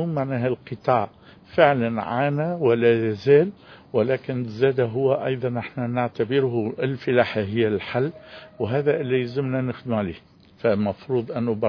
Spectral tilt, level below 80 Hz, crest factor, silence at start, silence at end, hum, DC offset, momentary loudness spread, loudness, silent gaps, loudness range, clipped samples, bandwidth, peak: -9 dB/octave; -60 dBFS; 22 dB; 0 s; 0 s; none; under 0.1%; 9 LU; -23 LUFS; none; 4 LU; under 0.1%; 5.4 kHz; -2 dBFS